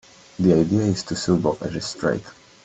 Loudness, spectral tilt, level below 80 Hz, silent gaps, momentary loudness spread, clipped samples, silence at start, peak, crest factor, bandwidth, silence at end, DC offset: -22 LUFS; -6 dB/octave; -50 dBFS; none; 10 LU; under 0.1%; 0.4 s; -4 dBFS; 18 dB; 8.4 kHz; 0.3 s; under 0.1%